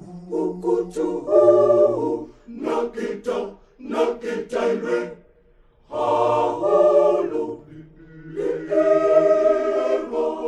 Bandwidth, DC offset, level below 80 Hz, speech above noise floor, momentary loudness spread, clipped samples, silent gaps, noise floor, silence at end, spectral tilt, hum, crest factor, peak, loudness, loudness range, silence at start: 9.8 kHz; under 0.1%; -54 dBFS; 34 dB; 14 LU; under 0.1%; none; -55 dBFS; 0 s; -6.5 dB/octave; none; 18 dB; -4 dBFS; -20 LUFS; 6 LU; 0 s